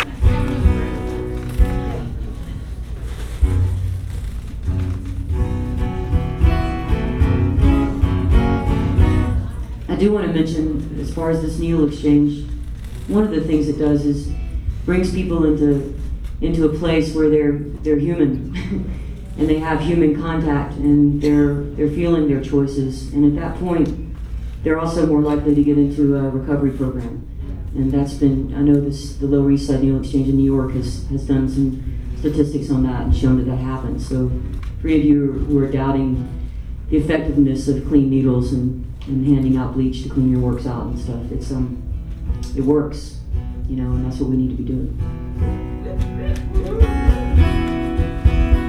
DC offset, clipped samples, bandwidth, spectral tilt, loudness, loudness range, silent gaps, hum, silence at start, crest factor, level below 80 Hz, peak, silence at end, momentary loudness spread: under 0.1%; under 0.1%; 11.5 kHz; -8.5 dB/octave; -19 LUFS; 5 LU; none; none; 0 s; 16 dB; -24 dBFS; -2 dBFS; 0 s; 12 LU